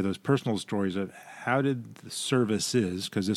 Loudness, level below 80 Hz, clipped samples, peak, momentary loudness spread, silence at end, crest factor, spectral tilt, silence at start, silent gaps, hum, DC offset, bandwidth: -29 LUFS; -68 dBFS; under 0.1%; -10 dBFS; 10 LU; 0 s; 18 dB; -5 dB/octave; 0 s; none; none; under 0.1%; 15.5 kHz